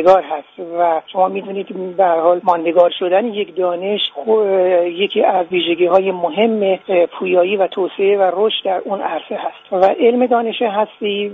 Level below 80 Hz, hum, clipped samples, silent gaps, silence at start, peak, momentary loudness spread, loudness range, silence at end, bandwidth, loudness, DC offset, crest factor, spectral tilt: -62 dBFS; none; under 0.1%; none; 0 s; 0 dBFS; 9 LU; 1 LU; 0 s; 5.8 kHz; -16 LUFS; under 0.1%; 16 dB; -2.5 dB/octave